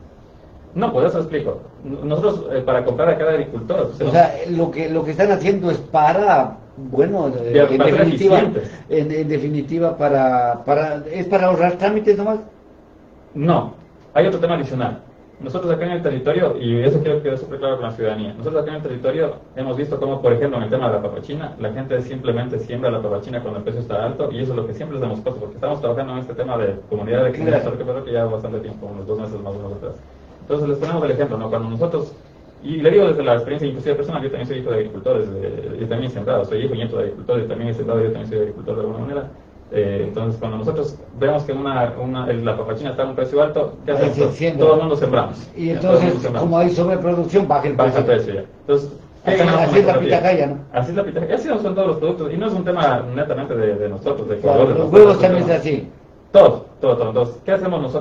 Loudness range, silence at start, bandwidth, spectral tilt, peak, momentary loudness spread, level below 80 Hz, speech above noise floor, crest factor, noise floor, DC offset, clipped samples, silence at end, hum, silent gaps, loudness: 8 LU; 0 s; 7.4 kHz; -8 dB/octave; 0 dBFS; 12 LU; -48 dBFS; 28 dB; 18 dB; -45 dBFS; under 0.1%; under 0.1%; 0 s; none; none; -19 LUFS